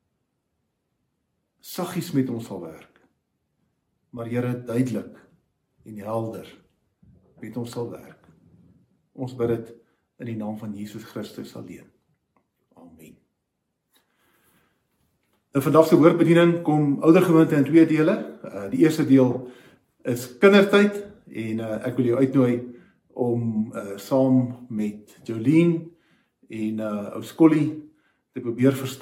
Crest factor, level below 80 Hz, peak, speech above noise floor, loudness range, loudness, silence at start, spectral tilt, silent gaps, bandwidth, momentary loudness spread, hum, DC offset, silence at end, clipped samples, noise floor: 22 dB; -68 dBFS; -2 dBFS; 57 dB; 17 LU; -21 LUFS; 1.65 s; -7 dB/octave; none; 16.5 kHz; 21 LU; none; under 0.1%; 0 s; under 0.1%; -78 dBFS